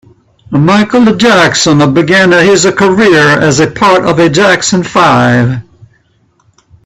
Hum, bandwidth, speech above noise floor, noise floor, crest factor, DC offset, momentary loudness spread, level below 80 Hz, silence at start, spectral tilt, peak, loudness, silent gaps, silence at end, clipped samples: none; 13.5 kHz; 45 dB; -52 dBFS; 8 dB; under 0.1%; 4 LU; -42 dBFS; 0.5 s; -4.5 dB/octave; 0 dBFS; -7 LUFS; none; 1.25 s; 0.3%